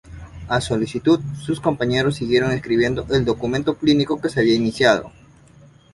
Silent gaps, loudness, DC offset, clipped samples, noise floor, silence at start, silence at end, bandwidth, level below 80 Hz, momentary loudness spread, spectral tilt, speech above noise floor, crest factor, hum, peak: none; -20 LUFS; under 0.1%; under 0.1%; -48 dBFS; 0.05 s; 0.85 s; 11.5 kHz; -44 dBFS; 6 LU; -6 dB/octave; 29 dB; 18 dB; none; -2 dBFS